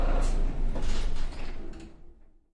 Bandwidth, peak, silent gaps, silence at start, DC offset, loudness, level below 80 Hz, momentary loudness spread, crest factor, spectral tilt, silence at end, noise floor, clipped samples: 9.2 kHz; -16 dBFS; none; 0 s; under 0.1%; -35 LUFS; -28 dBFS; 15 LU; 12 dB; -5.5 dB/octave; 0.45 s; -50 dBFS; under 0.1%